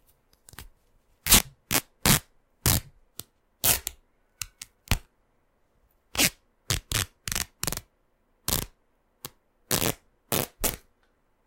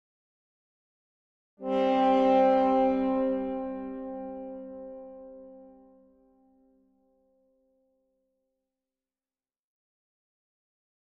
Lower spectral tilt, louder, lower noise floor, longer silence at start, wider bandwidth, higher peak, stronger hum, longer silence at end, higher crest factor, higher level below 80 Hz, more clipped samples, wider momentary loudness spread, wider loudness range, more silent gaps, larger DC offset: second, -2 dB/octave vs -7 dB/octave; about the same, -26 LUFS vs -26 LUFS; second, -69 dBFS vs under -90 dBFS; second, 0.6 s vs 1.6 s; first, 17 kHz vs 6.4 kHz; first, 0 dBFS vs -14 dBFS; neither; second, 0.7 s vs 5.35 s; first, 30 dB vs 18 dB; first, -42 dBFS vs -64 dBFS; neither; about the same, 22 LU vs 23 LU; second, 7 LU vs 20 LU; neither; neither